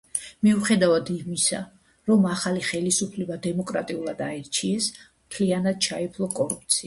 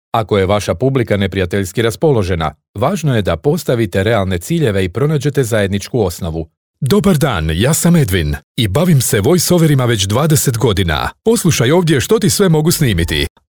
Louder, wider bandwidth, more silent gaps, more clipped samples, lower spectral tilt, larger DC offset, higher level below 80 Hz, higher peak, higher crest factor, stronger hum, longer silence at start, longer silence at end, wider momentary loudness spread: second, -24 LUFS vs -14 LUFS; second, 11.5 kHz vs over 20 kHz; second, none vs 2.68-2.74 s, 6.57-6.74 s, 8.43-8.55 s; neither; about the same, -4 dB/octave vs -5 dB/octave; neither; second, -60 dBFS vs -32 dBFS; second, -6 dBFS vs 0 dBFS; first, 18 dB vs 12 dB; neither; about the same, 0.15 s vs 0.15 s; second, 0 s vs 0.2 s; first, 10 LU vs 6 LU